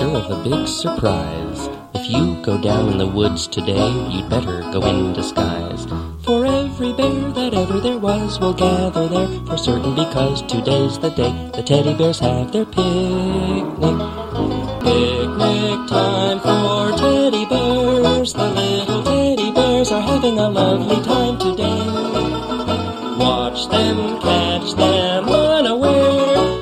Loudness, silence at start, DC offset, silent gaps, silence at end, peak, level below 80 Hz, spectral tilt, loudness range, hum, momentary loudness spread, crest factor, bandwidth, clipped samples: -18 LUFS; 0 s; under 0.1%; none; 0 s; 0 dBFS; -38 dBFS; -5.5 dB/octave; 3 LU; none; 6 LU; 16 dB; 14 kHz; under 0.1%